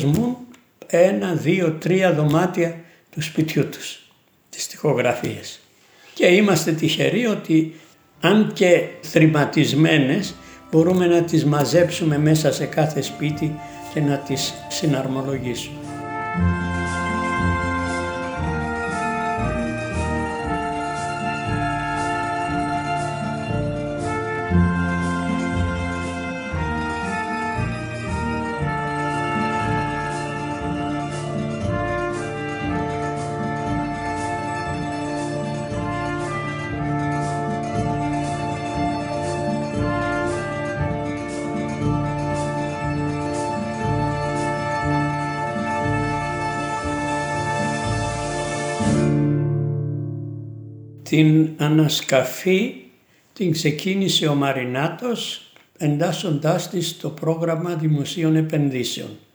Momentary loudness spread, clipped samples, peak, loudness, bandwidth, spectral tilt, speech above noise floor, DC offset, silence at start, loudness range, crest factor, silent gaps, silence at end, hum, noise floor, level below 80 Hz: 9 LU; under 0.1%; -2 dBFS; -22 LUFS; over 20 kHz; -5.5 dB/octave; 35 dB; under 0.1%; 0 s; 7 LU; 20 dB; none; 0.15 s; none; -54 dBFS; -42 dBFS